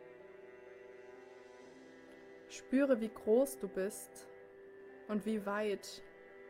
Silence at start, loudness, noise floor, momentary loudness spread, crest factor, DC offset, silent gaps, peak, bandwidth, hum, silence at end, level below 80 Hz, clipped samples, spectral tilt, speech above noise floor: 0 s; -36 LUFS; -57 dBFS; 24 LU; 20 dB; under 0.1%; none; -20 dBFS; 16.5 kHz; none; 0 s; -76 dBFS; under 0.1%; -5 dB/octave; 21 dB